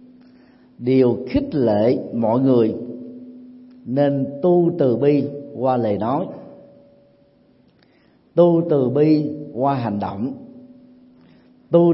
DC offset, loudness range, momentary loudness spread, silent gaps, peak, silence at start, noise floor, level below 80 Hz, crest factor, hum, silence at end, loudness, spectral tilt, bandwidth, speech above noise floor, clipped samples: under 0.1%; 3 LU; 15 LU; none; -2 dBFS; 0.8 s; -56 dBFS; -54 dBFS; 18 dB; none; 0 s; -19 LUFS; -13 dB/octave; 5.8 kHz; 38 dB; under 0.1%